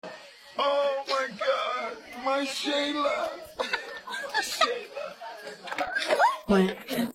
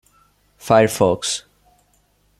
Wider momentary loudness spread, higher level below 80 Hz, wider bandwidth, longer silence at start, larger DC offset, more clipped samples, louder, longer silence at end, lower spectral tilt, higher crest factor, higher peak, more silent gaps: about the same, 14 LU vs 12 LU; second, -60 dBFS vs -54 dBFS; about the same, 16.5 kHz vs 15.5 kHz; second, 0.05 s vs 0.65 s; neither; neither; second, -28 LUFS vs -18 LUFS; second, 0 s vs 1 s; about the same, -4 dB/octave vs -4 dB/octave; about the same, 22 dB vs 20 dB; second, -8 dBFS vs -2 dBFS; neither